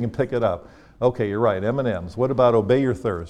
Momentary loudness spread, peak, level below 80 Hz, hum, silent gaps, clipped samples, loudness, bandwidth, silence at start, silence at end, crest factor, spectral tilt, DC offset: 7 LU; -6 dBFS; -48 dBFS; none; none; under 0.1%; -21 LUFS; 10 kHz; 0 s; 0 s; 16 dB; -8.5 dB/octave; under 0.1%